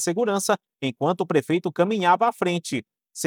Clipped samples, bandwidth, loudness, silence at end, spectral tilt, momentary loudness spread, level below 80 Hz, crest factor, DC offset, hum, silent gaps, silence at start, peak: under 0.1%; 18 kHz; -23 LUFS; 0 s; -4.5 dB/octave; 11 LU; -80 dBFS; 18 dB; under 0.1%; none; none; 0 s; -6 dBFS